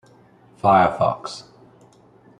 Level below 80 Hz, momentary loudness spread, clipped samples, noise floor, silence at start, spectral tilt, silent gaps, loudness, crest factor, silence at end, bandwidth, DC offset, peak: -58 dBFS; 19 LU; under 0.1%; -52 dBFS; 0.65 s; -6 dB/octave; none; -19 LUFS; 20 dB; 1 s; 11 kHz; under 0.1%; -2 dBFS